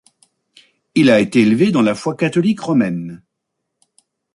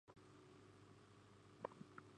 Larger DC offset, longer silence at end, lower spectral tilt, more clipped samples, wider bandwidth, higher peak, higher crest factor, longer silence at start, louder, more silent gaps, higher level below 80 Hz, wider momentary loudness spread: neither; first, 1.2 s vs 0 s; about the same, -6.5 dB/octave vs -6 dB/octave; neither; first, 11.5 kHz vs 10 kHz; first, -2 dBFS vs -30 dBFS; second, 16 dB vs 30 dB; first, 0.95 s vs 0.05 s; first, -15 LUFS vs -61 LUFS; neither; first, -58 dBFS vs -84 dBFS; about the same, 9 LU vs 11 LU